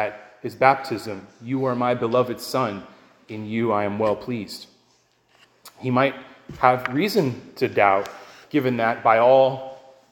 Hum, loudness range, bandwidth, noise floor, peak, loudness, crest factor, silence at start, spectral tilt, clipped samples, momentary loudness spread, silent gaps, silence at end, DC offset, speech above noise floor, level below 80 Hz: none; 7 LU; 17 kHz; -62 dBFS; 0 dBFS; -22 LUFS; 22 dB; 0 s; -6 dB/octave; under 0.1%; 18 LU; none; 0.3 s; under 0.1%; 41 dB; -62 dBFS